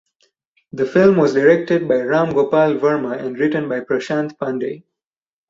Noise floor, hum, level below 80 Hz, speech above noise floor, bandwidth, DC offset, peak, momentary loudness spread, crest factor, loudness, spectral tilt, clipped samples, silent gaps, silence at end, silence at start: -64 dBFS; none; -60 dBFS; 48 dB; 7.6 kHz; under 0.1%; -2 dBFS; 11 LU; 16 dB; -17 LUFS; -7.5 dB/octave; under 0.1%; none; 0.7 s; 0.75 s